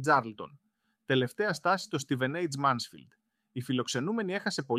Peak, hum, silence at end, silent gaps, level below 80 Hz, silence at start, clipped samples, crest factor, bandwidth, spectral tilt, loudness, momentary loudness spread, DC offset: -12 dBFS; none; 0 s; none; -76 dBFS; 0 s; under 0.1%; 20 dB; 15.5 kHz; -5 dB/octave; -31 LUFS; 14 LU; under 0.1%